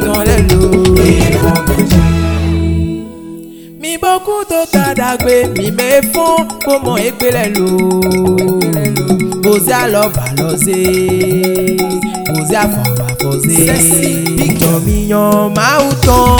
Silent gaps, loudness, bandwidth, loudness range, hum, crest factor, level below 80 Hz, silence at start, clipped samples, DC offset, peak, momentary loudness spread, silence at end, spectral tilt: none; -11 LUFS; over 20 kHz; 3 LU; none; 10 dB; -22 dBFS; 0 s; 0.5%; under 0.1%; 0 dBFS; 6 LU; 0 s; -5 dB/octave